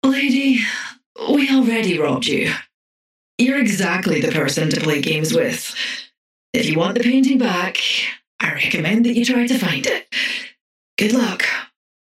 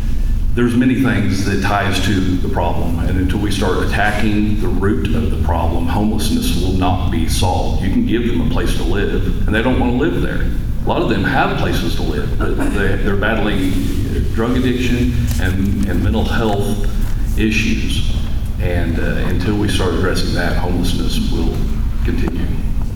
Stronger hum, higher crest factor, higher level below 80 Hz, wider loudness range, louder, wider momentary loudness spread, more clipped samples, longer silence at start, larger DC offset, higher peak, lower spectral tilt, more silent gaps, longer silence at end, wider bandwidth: neither; about the same, 16 dB vs 12 dB; second, -62 dBFS vs -20 dBFS; about the same, 2 LU vs 1 LU; about the same, -18 LUFS vs -18 LUFS; first, 9 LU vs 5 LU; neither; about the same, 0.05 s vs 0 s; neither; about the same, -2 dBFS vs -2 dBFS; second, -4 dB/octave vs -6 dB/octave; first, 1.06-1.15 s, 2.74-3.38 s, 6.18-6.53 s, 8.27-8.39 s, 10.61-10.97 s vs none; first, 0.35 s vs 0 s; second, 15.5 kHz vs 17.5 kHz